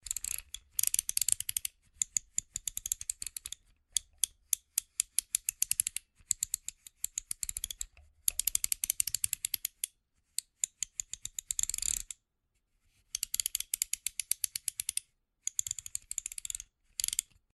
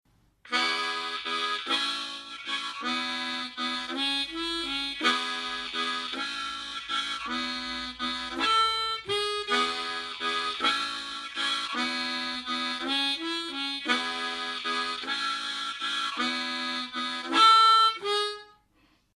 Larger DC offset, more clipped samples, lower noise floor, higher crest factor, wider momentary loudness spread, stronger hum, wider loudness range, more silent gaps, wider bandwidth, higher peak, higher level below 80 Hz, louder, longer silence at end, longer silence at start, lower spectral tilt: neither; neither; first, -80 dBFS vs -66 dBFS; first, 32 dB vs 22 dB; about the same, 10 LU vs 8 LU; neither; second, 3 LU vs 6 LU; neither; about the same, 13 kHz vs 14 kHz; first, -4 dBFS vs -8 dBFS; about the same, -60 dBFS vs -64 dBFS; second, -34 LUFS vs -27 LUFS; second, 0.3 s vs 0.65 s; second, 0.05 s vs 0.45 s; second, 3 dB/octave vs -0.5 dB/octave